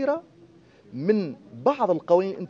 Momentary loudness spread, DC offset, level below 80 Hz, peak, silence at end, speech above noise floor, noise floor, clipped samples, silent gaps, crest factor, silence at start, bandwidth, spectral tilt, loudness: 11 LU; under 0.1%; -74 dBFS; -6 dBFS; 0 s; 29 dB; -53 dBFS; under 0.1%; none; 18 dB; 0 s; 7 kHz; -8.5 dB/octave; -25 LUFS